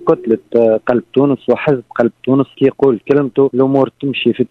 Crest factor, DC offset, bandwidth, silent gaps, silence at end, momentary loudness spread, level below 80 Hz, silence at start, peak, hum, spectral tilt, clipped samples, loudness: 12 dB; under 0.1%; 5 kHz; none; 0.05 s; 4 LU; -54 dBFS; 0 s; 0 dBFS; none; -9 dB/octave; under 0.1%; -14 LUFS